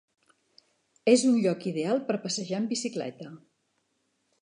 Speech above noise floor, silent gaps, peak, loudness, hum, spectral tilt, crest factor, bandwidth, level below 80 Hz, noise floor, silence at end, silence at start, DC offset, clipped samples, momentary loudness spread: 48 dB; none; -8 dBFS; -27 LUFS; none; -4.5 dB/octave; 22 dB; 11 kHz; -82 dBFS; -75 dBFS; 1.05 s; 1.05 s; under 0.1%; under 0.1%; 16 LU